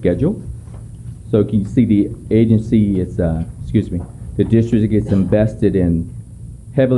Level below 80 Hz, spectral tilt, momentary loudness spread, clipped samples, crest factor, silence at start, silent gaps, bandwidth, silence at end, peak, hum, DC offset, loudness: -34 dBFS; -9.5 dB/octave; 19 LU; under 0.1%; 14 dB; 0 s; none; 11 kHz; 0 s; -2 dBFS; none; under 0.1%; -16 LUFS